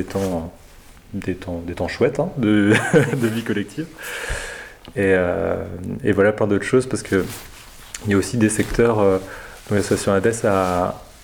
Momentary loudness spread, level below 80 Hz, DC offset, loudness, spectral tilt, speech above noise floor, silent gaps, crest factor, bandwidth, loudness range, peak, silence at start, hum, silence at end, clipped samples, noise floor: 14 LU; -42 dBFS; under 0.1%; -20 LUFS; -5.5 dB/octave; 25 dB; none; 18 dB; over 20 kHz; 2 LU; -2 dBFS; 0 s; none; 0.1 s; under 0.1%; -44 dBFS